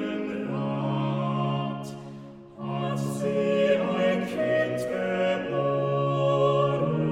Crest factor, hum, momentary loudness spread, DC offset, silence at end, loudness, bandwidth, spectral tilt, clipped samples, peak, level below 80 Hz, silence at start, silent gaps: 14 dB; none; 12 LU; under 0.1%; 0 s; -26 LUFS; 14 kHz; -7 dB/octave; under 0.1%; -12 dBFS; -62 dBFS; 0 s; none